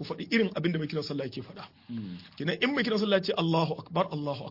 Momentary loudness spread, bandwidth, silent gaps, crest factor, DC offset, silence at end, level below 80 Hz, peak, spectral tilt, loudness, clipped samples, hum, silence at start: 14 LU; 5.8 kHz; none; 18 dB; under 0.1%; 0 s; -70 dBFS; -12 dBFS; -6.5 dB/octave; -29 LUFS; under 0.1%; none; 0 s